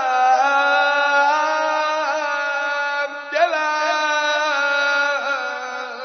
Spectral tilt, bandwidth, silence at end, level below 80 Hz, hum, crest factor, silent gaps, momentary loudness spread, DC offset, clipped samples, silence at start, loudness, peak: 1.5 dB/octave; 6.6 kHz; 0 s; under -90 dBFS; none; 14 dB; none; 7 LU; under 0.1%; under 0.1%; 0 s; -19 LUFS; -4 dBFS